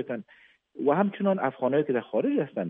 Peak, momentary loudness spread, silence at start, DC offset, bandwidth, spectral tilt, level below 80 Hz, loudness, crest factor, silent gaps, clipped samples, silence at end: -10 dBFS; 5 LU; 0 s; under 0.1%; 3.8 kHz; -11 dB/octave; -80 dBFS; -27 LUFS; 16 dB; none; under 0.1%; 0 s